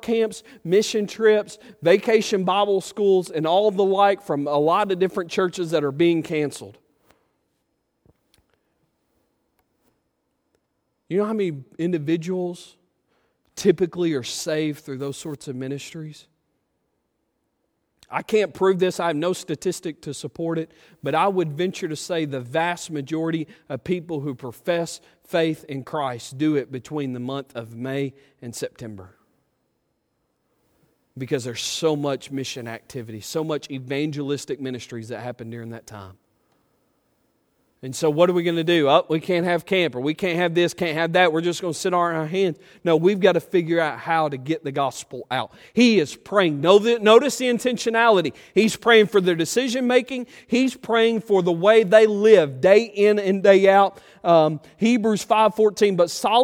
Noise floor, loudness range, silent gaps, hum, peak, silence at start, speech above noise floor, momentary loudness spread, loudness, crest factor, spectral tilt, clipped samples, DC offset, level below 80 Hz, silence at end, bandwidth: -73 dBFS; 14 LU; none; none; 0 dBFS; 0.05 s; 52 dB; 16 LU; -21 LUFS; 22 dB; -5 dB/octave; under 0.1%; under 0.1%; -66 dBFS; 0 s; 16.5 kHz